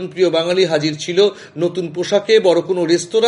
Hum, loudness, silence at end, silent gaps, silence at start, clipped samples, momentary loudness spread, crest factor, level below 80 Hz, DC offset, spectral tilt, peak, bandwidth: none; -16 LUFS; 0 s; none; 0 s; under 0.1%; 8 LU; 14 dB; -66 dBFS; under 0.1%; -4.5 dB/octave; 0 dBFS; 11 kHz